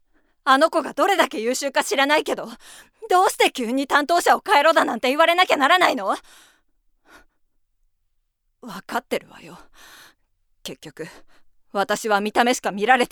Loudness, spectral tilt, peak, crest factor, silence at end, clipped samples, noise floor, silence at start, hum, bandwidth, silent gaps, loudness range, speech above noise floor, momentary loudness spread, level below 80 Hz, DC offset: -19 LUFS; -2 dB/octave; 0 dBFS; 20 dB; 0.05 s; under 0.1%; -70 dBFS; 0.45 s; none; 20 kHz; none; 17 LU; 49 dB; 20 LU; -62 dBFS; under 0.1%